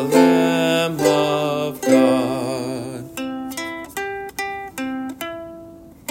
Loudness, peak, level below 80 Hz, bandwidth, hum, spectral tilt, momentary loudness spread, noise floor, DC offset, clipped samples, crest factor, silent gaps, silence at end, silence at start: -20 LUFS; -2 dBFS; -56 dBFS; 16.5 kHz; none; -5 dB/octave; 15 LU; -41 dBFS; under 0.1%; under 0.1%; 18 dB; none; 0.2 s; 0 s